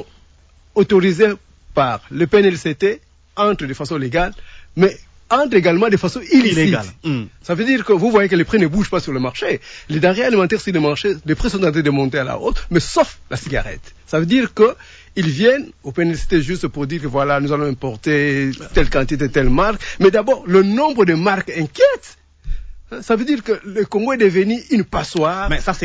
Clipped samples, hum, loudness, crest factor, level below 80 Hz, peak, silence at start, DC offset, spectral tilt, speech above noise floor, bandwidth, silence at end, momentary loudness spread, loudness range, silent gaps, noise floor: under 0.1%; none; -17 LUFS; 16 dB; -32 dBFS; -2 dBFS; 0 s; under 0.1%; -6 dB/octave; 33 dB; 8 kHz; 0 s; 10 LU; 3 LU; none; -49 dBFS